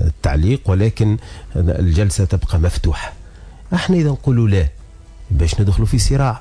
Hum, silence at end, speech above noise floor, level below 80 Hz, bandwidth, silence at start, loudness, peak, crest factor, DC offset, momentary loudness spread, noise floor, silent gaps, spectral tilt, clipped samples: none; 0 s; 22 dB; -22 dBFS; 11 kHz; 0 s; -17 LUFS; -6 dBFS; 10 dB; under 0.1%; 7 LU; -37 dBFS; none; -6.5 dB/octave; under 0.1%